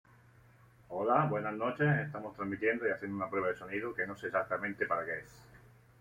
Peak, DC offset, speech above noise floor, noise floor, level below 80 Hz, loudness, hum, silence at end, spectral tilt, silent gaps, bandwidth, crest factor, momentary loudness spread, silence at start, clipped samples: -14 dBFS; under 0.1%; 27 dB; -62 dBFS; -70 dBFS; -34 LUFS; none; 0.4 s; -8 dB/octave; none; 11 kHz; 22 dB; 10 LU; 0.9 s; under 0.1%